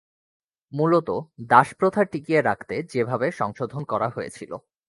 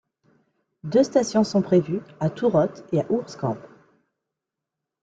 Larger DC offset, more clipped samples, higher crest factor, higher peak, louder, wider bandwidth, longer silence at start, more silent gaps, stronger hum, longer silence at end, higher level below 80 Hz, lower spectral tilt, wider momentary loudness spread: neither; neither; first, 24 dB vs 18 dB; first, 0 dBFS vs -6 dBFS; about the same, -23 LUFS vs -23 LUFS; first, 11.5 kHz vs 9 kHz; about the same, 0.75 s vs 0.85 s; neither; neither; second, 0.3 s vs 1.4 s; about the same, -62 dBFS vs -64 dBFS; about the same, -7 dB/octave vs -7 dB/octave; first, 16 LU vs 10 LU